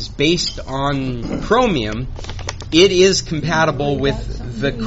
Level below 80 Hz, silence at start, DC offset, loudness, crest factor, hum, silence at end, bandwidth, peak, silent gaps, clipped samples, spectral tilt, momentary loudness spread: -30 dBFS; 0 s; under 0.1%; -17 LUFS; 16 dB; none; 0 s; 8 kHz; 0 dBFS; none; under 0.1%; -4 dB/octave; 15 LU